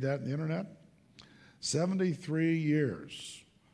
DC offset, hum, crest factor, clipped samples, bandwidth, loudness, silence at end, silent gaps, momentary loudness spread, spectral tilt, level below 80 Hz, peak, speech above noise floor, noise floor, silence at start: under 0.1%; none; 16 dB; under 0.1%; 11 kHz; -33 LUFS; 0.35 s; none; 15 LU; -5.5 dB/octave; -72 dBFS; -18 dBFS; 27 dB; -59 dBFS; 0 s